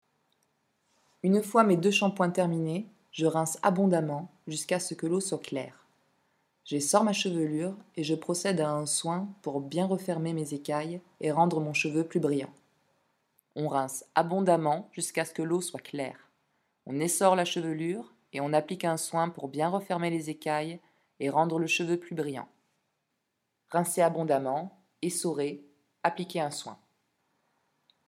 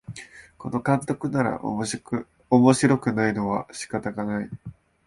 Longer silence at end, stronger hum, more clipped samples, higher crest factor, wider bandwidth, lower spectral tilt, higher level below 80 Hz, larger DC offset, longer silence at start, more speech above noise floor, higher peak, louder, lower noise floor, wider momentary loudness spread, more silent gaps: first, 1.35 s vs 0.35 s; neither; neither; about the same, 24 dB vs 20 dB; first, 16 kHz vs 11.5 kHz; second, -4.5 dB/octave vs -6 dB/octave; second, -80 dBFS vs -56 dBFS; neither; first, 1.25 s vs 0.1 s; first, 52 dB vs 21 dB; about the same, -6 dBFS vs -4 dBFS; second, -29 LUFS vs -24 LUFS; first, -81 dBFS vs -45 dBFS; second, 12 LU vs 19 LU; neither